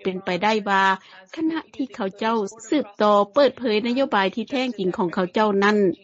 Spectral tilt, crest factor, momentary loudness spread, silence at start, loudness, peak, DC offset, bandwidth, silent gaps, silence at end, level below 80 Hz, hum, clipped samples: -3.5 dB/octave; 16 dB; 9 LU; 0 s; -22 LUFS; -6 dBFS; under 0.1%; 8 kHz; none; 0.1 s; -66 dBFS; none; under 0.1%